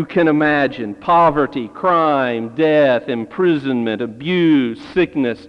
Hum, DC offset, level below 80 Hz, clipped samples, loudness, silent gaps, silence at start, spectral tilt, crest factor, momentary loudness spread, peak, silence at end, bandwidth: none; under 0.1%; -52 dBFS; under 0.1%; -16 LUFS; none; 0 s; -8 dB/octave; 12 dB; 7 LU; -4 dBFS; 0 s; 6.4 kHz